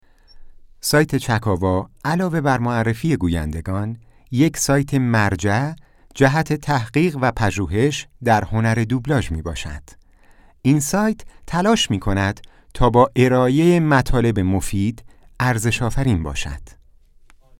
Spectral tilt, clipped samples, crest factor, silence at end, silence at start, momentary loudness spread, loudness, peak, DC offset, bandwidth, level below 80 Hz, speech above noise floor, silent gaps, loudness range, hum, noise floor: -5.5 dB/octave; under 0.1%; 18 dB; 0.95 s; 0.35 s; 11 LU; -19 LUFS; 0 dBFS; under 0.1%; 17.5 kHz; -36 dBFS; 31 dB; none; 4 LU; none; -49 dBFS